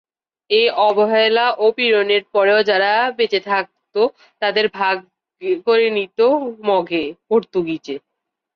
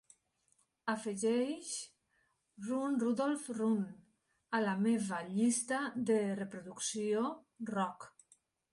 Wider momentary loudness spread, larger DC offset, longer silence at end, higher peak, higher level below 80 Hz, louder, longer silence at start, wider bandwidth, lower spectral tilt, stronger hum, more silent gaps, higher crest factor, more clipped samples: about the same, 9 LU vs 11 LU; neither; about the same, 0.55 s vs 0.65 s; first, -4 dBFS vs -20 dBFS; first, -66 dBFS vs -80 dBFS; first, -17 LUFS vs -36 LUFS; second, 0.5 s vs 0.85 s; second, 6.4 kHz vs 11.5 kHz; about the same, -5.5 dB/octave vs -4.5 dB/octave; neither; neither; about the same, 14 dB vs 16 dB; neither